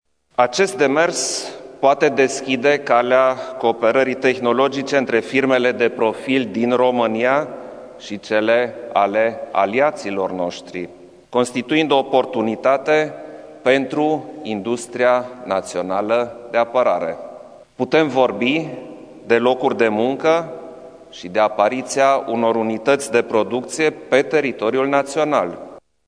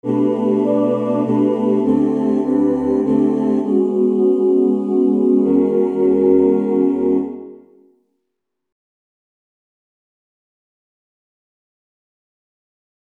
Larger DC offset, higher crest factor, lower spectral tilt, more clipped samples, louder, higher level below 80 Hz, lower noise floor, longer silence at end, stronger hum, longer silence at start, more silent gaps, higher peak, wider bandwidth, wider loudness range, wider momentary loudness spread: neither; about the same, 18 dB vs 16 dB; second, -4 dB/octave vs -10 dB/octave; neither; about the same, -18 LUFS vs -16 LUFS; second, -64 dBFS vs -54 dBFS; second, -40 dBFS vs -78 dBFS; second, 0.3 s vs 5.5 s; neither; first, 0.4 s vs 0.05 s; neither; about the same, 0 dBFS vs -2 dBFS; first, 11 kHz vs 3.5 kHz; second, 3 LU vs 7 LU; first, 11 LU vs 3 LU